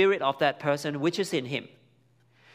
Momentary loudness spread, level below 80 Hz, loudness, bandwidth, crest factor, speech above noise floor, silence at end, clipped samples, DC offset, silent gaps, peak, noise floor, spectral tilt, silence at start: 8 LU; -76 dBFS; -28 LUFS; 15.5 kHz; 20 dB; 37 dB; 0.9 s; under 0.1%; under 0.1%; none; -8 dBFS; -64 dBFS; -5 dB/octave; 0 s